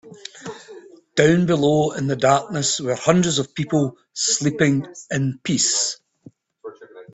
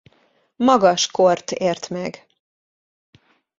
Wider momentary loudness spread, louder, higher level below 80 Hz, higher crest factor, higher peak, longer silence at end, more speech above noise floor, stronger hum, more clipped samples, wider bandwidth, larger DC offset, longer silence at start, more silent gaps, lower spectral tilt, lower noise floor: first, 19 LU vs 13 LU; about the same, -20 LUFS vs -18 LUFS; first, -56 dBFS vs -62 dBFS; about the same, 20 dB vs 20 dB; about the same, 0 dBFS vs -2 dBFS; second, 0.1 s vs 1.5 s; second, 30 dB vs 43 dB; neither; neither; about the same, 8.4 kHz vs 7.8 kHz; neither; second, 0.05 s vs 0.6 s; neither; about the same, -4 dB/octave vs -4 dB/octave; second, -49 dBFS vs -61 dBFS